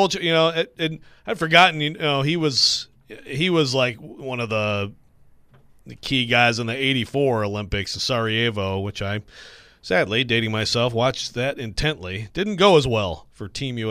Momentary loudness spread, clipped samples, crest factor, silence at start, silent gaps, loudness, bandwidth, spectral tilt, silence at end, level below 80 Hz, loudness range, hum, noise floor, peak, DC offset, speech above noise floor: 13 LU; under 0.1%; 20 dB; 0 s; none; -21 LUFS; 15.5 kHz; -4.5 dB/octave; 0 s; -46 dBFS; 4 LU; none; -52 dBFS; -2 dBFS; under 0.1%; 30 dB